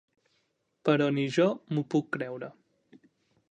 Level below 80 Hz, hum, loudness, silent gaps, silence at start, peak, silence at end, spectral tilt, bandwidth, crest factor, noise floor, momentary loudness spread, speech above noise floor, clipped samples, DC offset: -78 dBFS; none; -29 LUFS; none; 0.85 s; -10 dBFS; 1 s; -7 dB/octave; 9.4 kHz; 20 dB; -75 dBFS; 12 LU; 48 dB; under 0.1%; under 0.1%